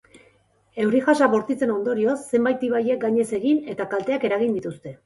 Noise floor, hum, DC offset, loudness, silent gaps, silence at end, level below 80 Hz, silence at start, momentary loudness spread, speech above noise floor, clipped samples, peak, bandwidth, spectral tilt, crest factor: -60 dBFS; none; under 0.1%; -22 LUFS; none; 0.1 s; -66 dBFS; 0.75 s; 7 LU; 39 dB; under 0.1%; -4 dBFS; 11.5 kHz; -6 dB/octave; 18 dB